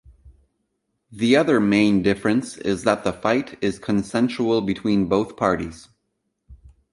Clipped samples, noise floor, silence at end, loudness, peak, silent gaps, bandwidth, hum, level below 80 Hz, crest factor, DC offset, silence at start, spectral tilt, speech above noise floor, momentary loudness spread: under 0.1%; -75 dBFS; 0.4 s; -21 LUFS; -2 dBFS; none; 11.5 kHz; none; -50 dBFS; 20 dB; under 0.1%; 0.25 s; -6 dB/octave; 54 dB; 8 LU